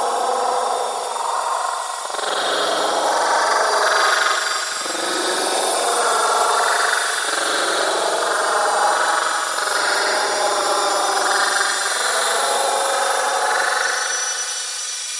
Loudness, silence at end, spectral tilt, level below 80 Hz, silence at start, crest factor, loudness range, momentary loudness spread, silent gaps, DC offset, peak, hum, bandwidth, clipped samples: -18 LUFS; 0 s; 1.5 dB/octave; -78 dBFS; 0 s; 16 dB; 1 LU; 5 LU; none; under 0.1%; -4 dBFS; none; 12 kHz; under 0.1%